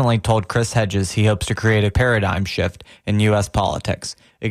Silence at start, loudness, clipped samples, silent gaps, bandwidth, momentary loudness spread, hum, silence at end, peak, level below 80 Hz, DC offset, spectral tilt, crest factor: 0 s; -19 LUFS; under 0.1%; none; 14 kHz; 8 LU; none; 0 s; -6 dBFS; -36 dBFS; under 0.1%; -5.5 dB/octave; 12 dB